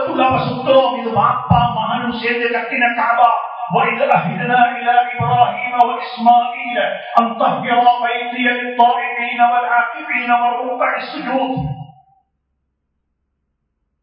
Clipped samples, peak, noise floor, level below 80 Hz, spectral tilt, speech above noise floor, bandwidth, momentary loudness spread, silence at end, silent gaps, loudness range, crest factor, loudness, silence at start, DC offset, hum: under 0.1%; 0 dBFS; -70 dBFS; -46 dBFS; -8 dB/octave; 55 dB; 5.4 kHz; 6 LU; 2.1 s; none; 5 LU; 16 dB; -15 LUFS; 0 s; under 0.1%; none